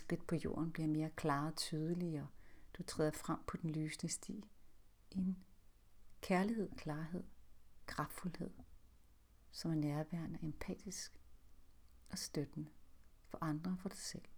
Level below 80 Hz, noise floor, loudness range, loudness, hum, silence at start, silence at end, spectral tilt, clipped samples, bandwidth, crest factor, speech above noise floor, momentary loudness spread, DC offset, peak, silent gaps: -64 dBFS; -66 dBFS; 6 LU; -43 LUFS; none; 0 s; 0 s; -5.5 dB/octave; under 0.1%; over 20 kHz; 20 dB; 24 dB; 13 LU; under 0.1%; -24 dBFS; none